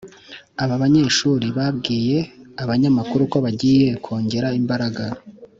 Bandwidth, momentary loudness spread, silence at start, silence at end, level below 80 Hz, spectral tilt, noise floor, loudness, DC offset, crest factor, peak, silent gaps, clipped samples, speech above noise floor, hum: 7.8 kHz; 14 LU; 0 s; 0.15 s; -52 dBFS; -5.5 dB/octave; -43 dBFS; -19 LUFS; under 0.1%; 16 dB; -4 dBFS; none; under 0.1%; 24 dB; none